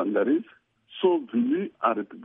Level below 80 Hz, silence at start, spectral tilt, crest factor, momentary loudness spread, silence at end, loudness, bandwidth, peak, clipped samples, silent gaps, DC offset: -80 dBFS; 0 s; -10 dB/octave; 16 dB; 4 LU; 0 s; -26 LUFS; 3.8 kHz; -8 dBFS; under 0.1%; none; under 0.1%